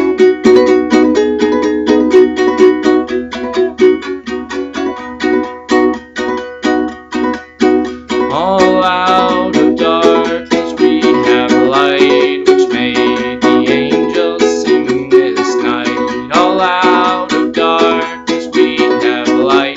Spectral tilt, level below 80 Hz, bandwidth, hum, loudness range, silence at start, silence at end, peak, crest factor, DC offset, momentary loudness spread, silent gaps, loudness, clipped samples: -4.5 dB/octave; -44 dBFS; 8 kHz; none; 5 LU; 0 s; 0 s; 0 dBFS; 10 dB; under 0.1%; 9 LU; none; -11 LUFS; 0.2%